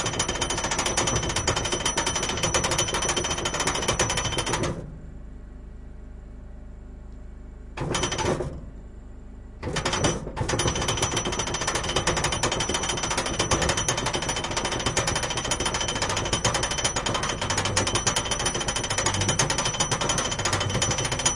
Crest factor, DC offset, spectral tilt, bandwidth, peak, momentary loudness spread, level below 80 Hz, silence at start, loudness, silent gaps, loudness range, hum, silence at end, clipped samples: 20 dB; under 0.1%; -2.5 dB/octave; 11.5 kHz; -6 dBFS; 21 LU; -38 dBFS; 0 s; -25 LUFS; none; 8 LU; none; 0 s; under 0.1%